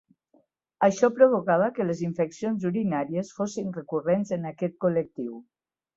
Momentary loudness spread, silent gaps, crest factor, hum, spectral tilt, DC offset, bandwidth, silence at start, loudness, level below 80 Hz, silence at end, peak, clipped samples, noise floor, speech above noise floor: 12 LU; none; 22 dB; none; -7 dB/octave; under 0.1%; 7.8 kHz; 0.8 s; -26 LUFS; -68 dBFS; 0.55 s; -4 dBFS; under 0.1%; -66 dBFS; 41 dB